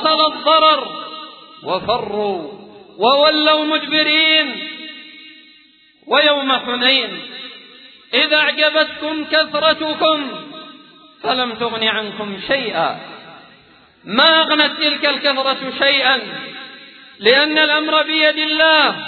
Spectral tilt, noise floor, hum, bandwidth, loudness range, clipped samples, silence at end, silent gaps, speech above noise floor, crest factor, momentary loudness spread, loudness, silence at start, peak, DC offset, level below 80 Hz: -5 dB/octave; -51 dBFS; none; 4.6 kHz; 4 LU; under 0.1%; 0 s; none; 35 dB; 18 dB; 19 LU; -14 LUFS; 0 s; 0 dBFS; under 0.1%; -60 dBFS